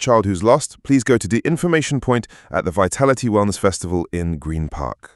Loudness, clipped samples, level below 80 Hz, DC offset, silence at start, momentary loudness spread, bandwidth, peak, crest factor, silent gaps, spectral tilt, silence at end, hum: -19 LUFS; under 0.1%; -38 dBFS; under 0.1%; 0 s; 9 LU; 12 kHz; 0 dBFS; 18 dB; none; -5.5 dB/octave; 0.1 s; none